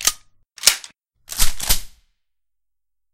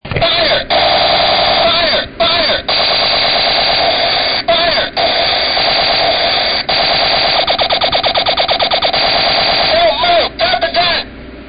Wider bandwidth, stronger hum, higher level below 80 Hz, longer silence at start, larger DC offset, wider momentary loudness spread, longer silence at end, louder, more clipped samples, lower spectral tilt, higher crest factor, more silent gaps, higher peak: first, 16.5 kHz vs 5.2 kHz; neither; first, -28 dBFS vs -36 dBFS; about the same, 0 s vs 0.05 s; second, under 0.1% vs 0.7%; first, 13 LU vs 3 LU; first, 1.25 s vs 0 s; second, -19 LUFS vs -10 LUFS; neither; second, 0.5 dB/octave vs -9 dB/octave; first, 22 dB vs 10 dB; neither; about the same, 0 dBFS vs -2 dBFS